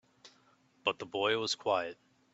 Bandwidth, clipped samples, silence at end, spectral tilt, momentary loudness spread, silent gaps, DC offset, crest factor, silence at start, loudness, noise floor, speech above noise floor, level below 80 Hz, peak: 8.2 kHz; under 0.1%; 0.4 s; -2.5 dB/octave; 5 LU; none; under 0.1%; 22 dB; 0.25 s; -33 LUFS; -68 dBFS; 35 dB; -80 dBFS; -14 dBFS